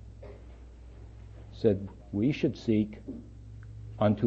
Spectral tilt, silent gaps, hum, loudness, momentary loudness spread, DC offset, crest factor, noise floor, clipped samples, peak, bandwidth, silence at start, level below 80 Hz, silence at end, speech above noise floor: -8.5 dB/octave; none; none; -30 LUFS; 22 LU; under 0.1%; 20 dB; -48 dBFS; under 0.1%; -12 dBFS; 7.6 kHz; 0 s; -50 dBFS; 0 s; 20 dB